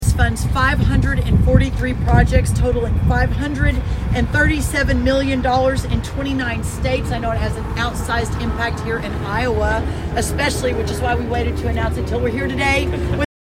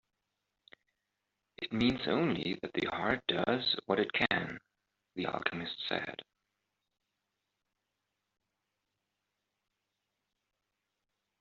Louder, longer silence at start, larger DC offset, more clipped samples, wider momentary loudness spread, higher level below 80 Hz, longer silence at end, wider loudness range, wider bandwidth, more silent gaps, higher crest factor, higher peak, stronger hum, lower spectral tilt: first, -18 LUFS vs -33 LUFS; second, 0 s vs 1.6 s; neither; neither; second, 6 LU vs 13 LU; first, -22 dBFS vs -68 dBFS; second, 0.15 s vs 5.2 s; second, 4 LU vs 10 LU; first, 16 kHz vs 7.4 kHz; neither; second, 18 dB vs 28 dB; first, 0 dBFS vs -10 dBFS; neither; first, -6 dB/octave vs -2.5 dB/octave